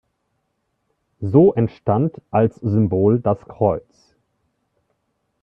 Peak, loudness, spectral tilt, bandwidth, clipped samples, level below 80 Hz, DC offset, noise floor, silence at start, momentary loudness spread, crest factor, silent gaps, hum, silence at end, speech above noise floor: -2 dBFS; -18 LUFS; -11.5 dB/octave; 5.6 kHz; under 0.1%; -54 dBFS; under 0.1%; -72 dBFS; 1.2 s; 8 LU; 18 dB; none; none; 1.65 s; 54 dB